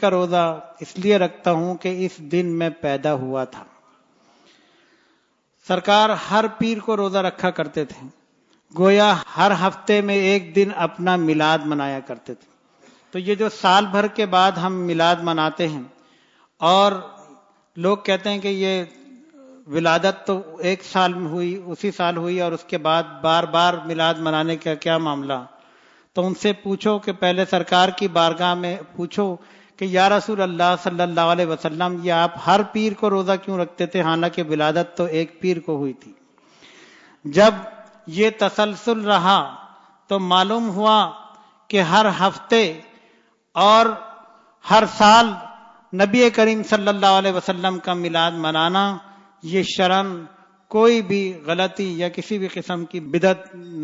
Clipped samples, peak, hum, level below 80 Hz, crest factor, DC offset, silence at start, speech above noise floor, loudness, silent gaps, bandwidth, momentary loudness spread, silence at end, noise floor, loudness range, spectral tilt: under 0.1%; -2 dBFS; none; -64 dBFS; 18 dB; under 0.1%; 0 s; 45 dB; -19 LUFS; none; 7.8 kHz; 12 LU; 0 s; -64 dBFS; 5 LU; -5 dB/octave